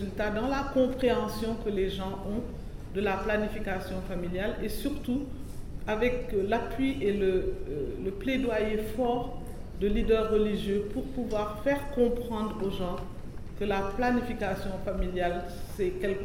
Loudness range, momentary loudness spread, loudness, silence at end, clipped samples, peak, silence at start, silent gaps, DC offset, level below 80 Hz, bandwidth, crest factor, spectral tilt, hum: 3 LU; 9 LU; -31 LUFS; 0 s; under 0.1%; -14 dBFS; 0 s; none; 0.3%; -40 dBFS; 16 kHz; 16 dB; -6.5 dB/octave; none